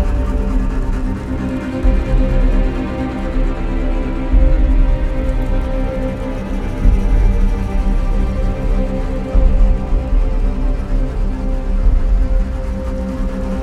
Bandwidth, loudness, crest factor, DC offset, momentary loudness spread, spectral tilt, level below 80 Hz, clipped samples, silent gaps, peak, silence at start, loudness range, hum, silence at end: 5.8 kHz; -19 LUFS; 14 dB; under 0.1%; 6 LU; -8.5 dB/octave; -14 dBFS; under 0.1%; none; 0 dBFS; 0 s; 1 LU; none; 0 s